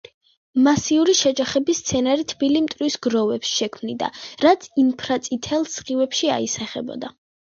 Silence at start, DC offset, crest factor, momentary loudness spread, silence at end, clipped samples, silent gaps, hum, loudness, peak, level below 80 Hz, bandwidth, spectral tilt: 0.55 s; under 0.1%; 18 dB; 10 LU; 0.5 s; under 0.1%; none; none; -21 LUFS; -4 dBFS; -56 dBFS; 7.8 kHz; -3.5 dB/octave